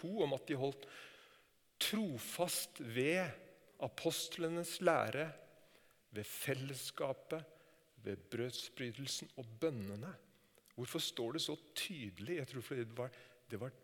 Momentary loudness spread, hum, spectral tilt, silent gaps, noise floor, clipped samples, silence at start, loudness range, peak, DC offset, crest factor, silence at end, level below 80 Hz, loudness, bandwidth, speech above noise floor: 16 LU; none; -4 dB/octave; none; -70 dBFS; under 0.1%; 0 s; 6 LU; -18 dBFS; under 0.1%; 24 dB; 0.05 s; -84 dBFS; -41 LUFS; 19 kHz; 29 dB